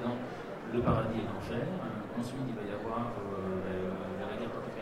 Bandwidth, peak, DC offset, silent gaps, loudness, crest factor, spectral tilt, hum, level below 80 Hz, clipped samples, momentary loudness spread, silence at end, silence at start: 15.5 kHz; -16 dBFS; under 0.1%; none; -36 LUFS; 18 dB; -7.5 dB/octave; none; -54 dBFS; under 0.1%; 7 LU; 0 s; 0 s